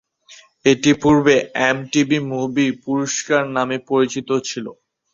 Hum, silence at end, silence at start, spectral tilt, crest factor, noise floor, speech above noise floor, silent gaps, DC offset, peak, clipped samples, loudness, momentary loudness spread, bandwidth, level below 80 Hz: none; 0.4 s; 0.3 s; -4.5 dB/octave; 16 dB; -47 dBFS; 30 dB; none; under 0.1%; -2 dBFS; under 0.1%; -18 LUFS; 8 LU; 7.6 kHz; -52 dBFS